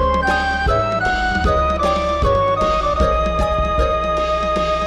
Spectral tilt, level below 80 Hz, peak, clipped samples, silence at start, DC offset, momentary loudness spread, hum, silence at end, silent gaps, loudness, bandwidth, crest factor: -5.5 dB/octave; -24 dBFS; -2 dBFS; under 0.1%; 0 s; under 0.1%; 2 LU; none; 0 s; none; -17 LUFS; 10.5 kHz; 14 dB